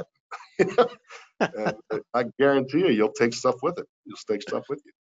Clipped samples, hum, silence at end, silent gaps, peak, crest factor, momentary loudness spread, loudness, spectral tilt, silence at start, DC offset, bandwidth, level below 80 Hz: under 0.1%; none; 0.2 s; 0.20-0.30 s, 3.89-4.04 s; -6 dBFS; 18 dB; 18 LU; -25 LUFS; -5.5 dB/octave; 0 s; under 0.1%; 8 kHz; -68 dBFS